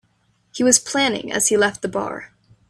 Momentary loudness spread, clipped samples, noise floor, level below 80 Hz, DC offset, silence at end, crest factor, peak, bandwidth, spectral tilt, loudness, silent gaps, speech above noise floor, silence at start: 15 LU; under 0.1%; -63 dBFS; -58 dBFS; under 0.1%; 0.45 s; 20 dB; 0 dBFS; 14.5 kHz; -2 dB/octave; -18 LUFS; none; 44 dB; 0.55 s